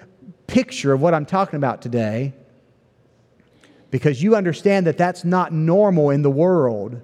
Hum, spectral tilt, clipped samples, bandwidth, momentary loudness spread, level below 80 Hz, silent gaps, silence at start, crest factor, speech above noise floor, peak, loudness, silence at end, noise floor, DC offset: none; -7.5 dB/octave; under 0.1%; 11 kHz; 7 LU; -60 dBFS; none; 0.3 s; 16 dB; 39 dB; -2 dBFS; -19 LUFS; 0 s; -57 dBFS; under 0.1%